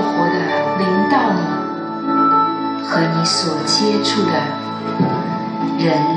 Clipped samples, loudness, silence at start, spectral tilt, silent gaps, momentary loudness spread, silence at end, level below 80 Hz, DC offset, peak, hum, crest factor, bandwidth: under 0.1%; -17 LUFS; 0 s; -5 dB/octave; none; 8 LU; 0 s; -72 dBFS; under 0.1%; -4 dBFS; none; 14 dB; 10.5 kHz